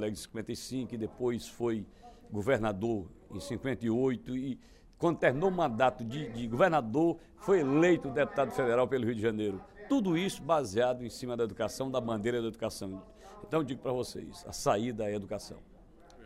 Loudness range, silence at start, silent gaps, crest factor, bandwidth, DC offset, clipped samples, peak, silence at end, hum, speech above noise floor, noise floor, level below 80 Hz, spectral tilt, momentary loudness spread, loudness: 6 LU; 0 s; none; 20 dB; 15.5 kHz; under 0.1%; under 0.1%; -12 dBFS; 0 s; none; 24 dB; -55 dBFS; -58 dBFS; -6 dB/octave; 13 LU; -32 LUFS